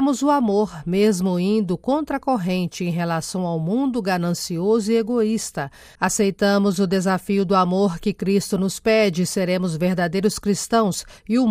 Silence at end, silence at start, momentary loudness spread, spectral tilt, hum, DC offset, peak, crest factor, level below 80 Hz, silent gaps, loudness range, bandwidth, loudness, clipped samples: 0 s; 0 s; 6 LU; -5.5 dB/octave; none; under 0.1%; -6 dBFS; 14 dB; -50 dBFS; none; 2 LU; 16 kHz; -21 LUFS; under 0.1%